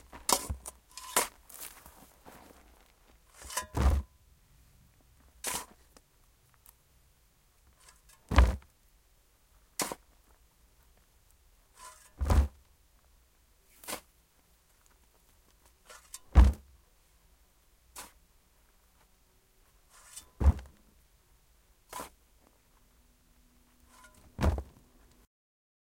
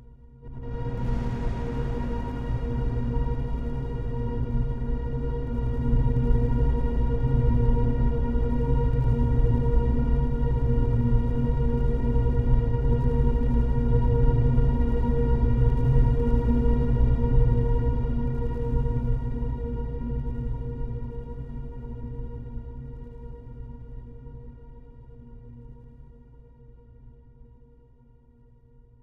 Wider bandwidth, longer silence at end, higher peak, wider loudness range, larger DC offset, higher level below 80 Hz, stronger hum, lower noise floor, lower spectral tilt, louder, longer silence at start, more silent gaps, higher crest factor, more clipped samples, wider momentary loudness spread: first, 16.5 kHz vs 4 kHz; second, 1.3 s vs 1.5 s; first, -4 dBFS vs -8 dBFS; about the same, 17 LU vs 16 LU; neither; second, -38 dBFS vs -26 dBFS; neither; first, -66 dBFS vs -55 dBFS; second, -4.5 dB/octave vs -10.5 dB/octave; second, -32 LUFS vs -26 LUFS; first, 0.15 s vs 0 s; neither; first, 32 dB vs 16 dB; neither; first, 27 LU vs 17 LU